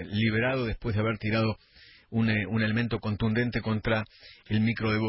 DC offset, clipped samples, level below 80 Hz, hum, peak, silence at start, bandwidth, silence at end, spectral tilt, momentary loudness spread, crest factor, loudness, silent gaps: under 0.1%; under 0.1%; -48 dBFS; none; -14 dBFS; 0 s; 5.8 kHz; 0 s; -11 dB/octave; 5 LU; 14 dB; -28 LUFS; none